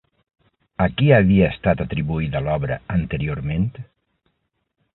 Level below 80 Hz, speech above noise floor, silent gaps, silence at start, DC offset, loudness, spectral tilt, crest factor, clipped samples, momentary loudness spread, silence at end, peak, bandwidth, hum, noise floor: -38 dBFS; 54 dB; none; 0.8 s; under 0.1%; -20 LUFS; -12.5 dB/octave; 20 dB; under 0.1%; 10 LU; 1.1 s; -2 dBFS; 4.1 kHz; none; -73 dBFS